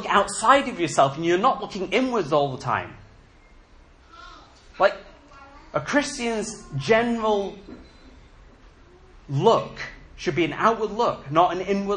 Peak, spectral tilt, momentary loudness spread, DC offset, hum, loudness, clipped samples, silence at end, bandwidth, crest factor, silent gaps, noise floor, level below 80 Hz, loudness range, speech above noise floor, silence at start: -4 dBFS; -4.5 dB/octave; 12 LU; under 0.1%; none; -23 LUFS; under 0.1%; 0 s; 10.5 kHz; 20 dB; none; -52 dBFS; -52 dBFS; 6 LU; 29 dB; 0 s